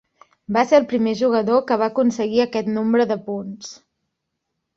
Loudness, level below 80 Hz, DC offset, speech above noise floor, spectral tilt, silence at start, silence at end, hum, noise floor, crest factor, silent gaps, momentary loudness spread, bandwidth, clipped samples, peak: -19 LUFS; -62 dBFS; under 0.1%; 59 dB; -5.5 dB/octave; 0.5 s; 1 s; none; -78 dBFS; 18 dB; none; 13 LU; 7.6 kHz; under 0.1%; -2 dBFS